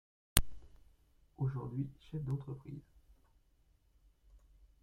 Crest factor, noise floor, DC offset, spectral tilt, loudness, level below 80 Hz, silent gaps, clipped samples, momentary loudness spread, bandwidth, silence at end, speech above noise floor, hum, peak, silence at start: 38 dB; -71 dBFS; under 0.1%; -4 dB/octave; -39 LUFS; -50 dBFS; none; under 0.1%; 17 LU; 16 kHz; 0.45 s; 30 dB; none; -2 dBFS; 0.35 s